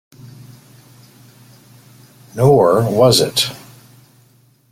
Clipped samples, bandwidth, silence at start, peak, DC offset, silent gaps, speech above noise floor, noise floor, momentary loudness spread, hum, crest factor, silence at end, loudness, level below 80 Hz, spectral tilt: under 0.1%; 16.5 kHz; 0.25 s; 0 dBFS; under 0.1%; none; 40 dB; -53 dBFS; 16 LU; none; 18 dB; 1.15 s; -13 LUFS; -52 dBFS; -5 dB/octave